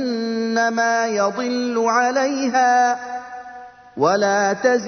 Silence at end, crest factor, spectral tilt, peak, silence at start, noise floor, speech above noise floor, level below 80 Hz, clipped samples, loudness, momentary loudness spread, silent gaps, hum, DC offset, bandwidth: 0 s; 16 dB; -3.5 dB/octave; -4 dBFS; 0 s; -39 dBFS; 21 dB; -66 dBFS; under 0.1%; -19 LUFS; 15 LU; none; none; under 0.1%; 6.6 kHz